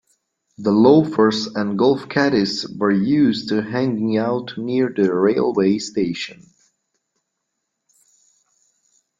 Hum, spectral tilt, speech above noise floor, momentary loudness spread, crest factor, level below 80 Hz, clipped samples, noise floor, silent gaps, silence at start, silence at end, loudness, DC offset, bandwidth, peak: none; -6 dB/octave; 59 dB; 9 LU; 18 dB; -60 dBFS; under 0.1%; -77 dBFS; none; 0.6 s; 2.85 s; -18 LUFS; under 0.1%; 7.6 kHz; -2 dBFS